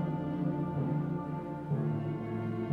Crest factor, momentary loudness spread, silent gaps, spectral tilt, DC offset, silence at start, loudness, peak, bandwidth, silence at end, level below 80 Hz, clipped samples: 12 dB; 4 LU; none; -10.5 dB/octave; under 0.1%; 0 s; -35 LUFS; -20 dBFS; 4.2 kHz; 0 s; -60 dBFS; under 0.1%